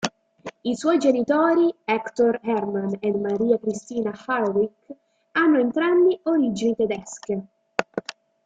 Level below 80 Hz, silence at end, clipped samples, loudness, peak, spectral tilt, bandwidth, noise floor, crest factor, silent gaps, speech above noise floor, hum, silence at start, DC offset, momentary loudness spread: -66 dBFS; 0.35 s; under 0.1%; -23 LUFS; -4 dBFS; -5.5 dB/octave; 9.2 kHz; -42 dBFS; 20 dB; none; 20 dB; none; 0 s; under 0.1%; 11 LU